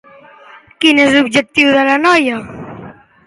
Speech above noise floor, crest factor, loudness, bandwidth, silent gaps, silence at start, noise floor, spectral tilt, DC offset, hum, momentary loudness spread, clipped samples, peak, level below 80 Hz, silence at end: 30 dB; 14 dB; -11 LUFS; 11.5 kHz; none; 0.8 s; -41 dBFS; -3.5 dB/octave; under 0.1%; none; 19 LU; under 0.1%; 0 dBFS; -52 dBFS; 0.35 s